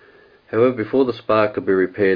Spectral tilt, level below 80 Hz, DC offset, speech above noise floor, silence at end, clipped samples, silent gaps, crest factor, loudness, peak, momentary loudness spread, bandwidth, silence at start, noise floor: -9 dB/octave; -56 dBFS; under 0.1%; 32 dB; 0 s; under 0.1%; none; 16 dB; -19 LUFS; -4 dBFS; 2 LU; 5.2 kHz; 0.55 s; -50 dBFS